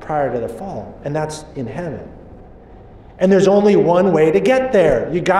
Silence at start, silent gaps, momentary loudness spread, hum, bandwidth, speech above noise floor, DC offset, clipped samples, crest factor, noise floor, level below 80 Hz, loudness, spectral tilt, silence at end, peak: 0 s; none; 16 LU; none; 12 kHz; 25 dB; under 0.1%; under 0.1%; 12 dB; -40 dBFS; -42 dBFS; -15 LUFS; -6.5 dB/octave; 0 s; -4 dBFS